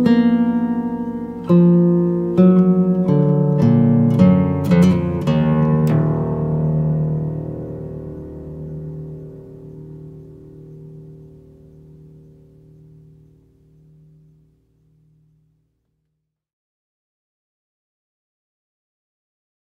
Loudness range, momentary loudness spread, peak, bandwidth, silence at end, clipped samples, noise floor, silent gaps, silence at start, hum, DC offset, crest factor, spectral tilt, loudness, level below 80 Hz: 21 LU; 23 LU; -2 dBFS; 6.4 kHz; 8.5 s; under 0.1%; -76 dBFS; none; 0 s; none; under 0.1%; 18 dB; -10 dB/octave; -16 LUFS; -46 dBFS